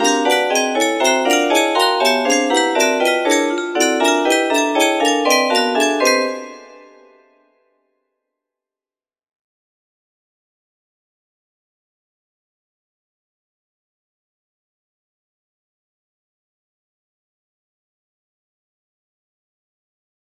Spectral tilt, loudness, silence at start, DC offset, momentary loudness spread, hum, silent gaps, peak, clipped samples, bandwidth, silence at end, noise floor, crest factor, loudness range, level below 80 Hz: 0 dB/octave; -15 LUFS; 0 s; under 0.1%; 3 LU; none; none; 0 dBFS; under 0.1%; 15.5 kHz; 13.6 s; under -90 dBFS; 20 dB; 6 LU; -72 dBFS